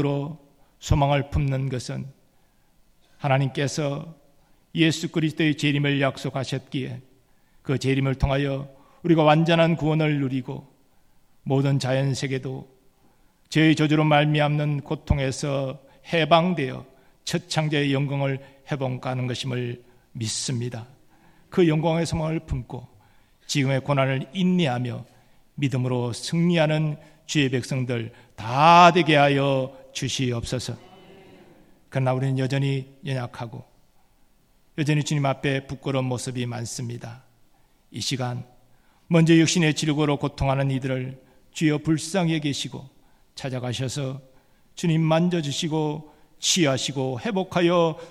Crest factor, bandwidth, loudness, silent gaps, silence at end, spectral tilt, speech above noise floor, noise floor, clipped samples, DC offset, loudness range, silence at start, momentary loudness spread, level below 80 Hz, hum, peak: 22 dB; 13.5 kHz; -23 LUFS; none; 0 s; -5.5 dB/octave; 37 dB; -60 dBFS; under 0.1%; under 0.1%; 8 LU; 0 s; 16 LU; -46 dBFS; none; -2 dBFS